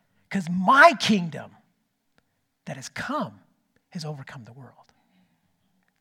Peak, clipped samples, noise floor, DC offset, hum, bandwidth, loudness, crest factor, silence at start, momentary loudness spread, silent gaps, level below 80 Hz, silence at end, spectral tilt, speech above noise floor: 0 dBFS; under 0.1%; -72 dBFS; under 0.1%; none; 16 kHz; -21 LUFS; 26 dB; 0.3 s; 25 LU; none; -70 dBFS; 1.35 s; -4.5 dB/octave; 49 dB